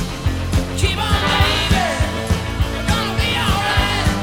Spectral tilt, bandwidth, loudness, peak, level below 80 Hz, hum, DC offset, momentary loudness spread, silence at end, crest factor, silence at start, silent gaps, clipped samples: -4.5 dB/octave; 17.5 kHz; -18 LUFS; -2 dBFS; -24 dBFS; none; 0.3%; 6 LU; 0 s; 16 dB; 0 s; none; under 0.1%